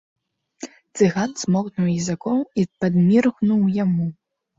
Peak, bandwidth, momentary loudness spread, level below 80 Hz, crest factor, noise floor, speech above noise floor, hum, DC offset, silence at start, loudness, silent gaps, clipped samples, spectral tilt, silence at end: -4 dBFS; 7.8 kHz; 14 LU; -58 dBFS; 16 dB; -40 dBFS; 21 dB; none; under 0.1%; 0.6 s; -20 LUFS; none; under 0.1%; -7 dB/octave; 0.45 s